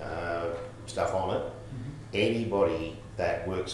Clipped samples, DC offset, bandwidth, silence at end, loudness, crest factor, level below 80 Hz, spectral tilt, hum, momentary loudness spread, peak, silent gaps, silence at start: under 0.1%; under 0.1%; 12 kHz; 0 s; -31 LUFS; 18 dB; -52 dBFS; -5.5 dB/octave; none; 12 LU; -14 dBFS; none; 0 s